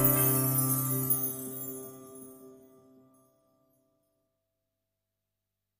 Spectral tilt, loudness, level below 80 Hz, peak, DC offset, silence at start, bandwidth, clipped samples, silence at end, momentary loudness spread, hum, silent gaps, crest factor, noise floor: -5 dB/octave; -27 LUFS; -64 dBFS; -12 dBFS; under 0.1%; 0 s; 15.5 kHz; under 0.1%; 3.25 s; 24 LU; 50 Hz at -85 dBFS; none; 22 dB; -87 dBFS